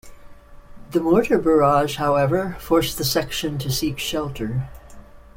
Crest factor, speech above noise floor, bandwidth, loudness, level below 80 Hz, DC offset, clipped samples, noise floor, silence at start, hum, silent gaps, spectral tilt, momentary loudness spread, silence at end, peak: 18 dB; 22 dB; 16.5 kHz; -21 LUFS; -42 dBFS; under 0.1%; under 0.1%; -42 dBFS; 0.05 s; none; none; -5 dB/octave; 10 LU; 0.15 s; -4 dBFS